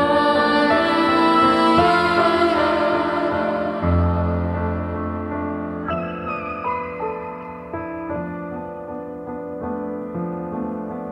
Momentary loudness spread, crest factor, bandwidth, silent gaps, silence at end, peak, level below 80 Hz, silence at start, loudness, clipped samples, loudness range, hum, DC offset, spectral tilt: 15 LU; 18 dB; 11.5 kHz; none; 0 s; -4 dBFS; -40 dBFS; 0 s; -20 LUFS; under 0.1%; 12 LU; none; under 0.1%; -7 dB/octave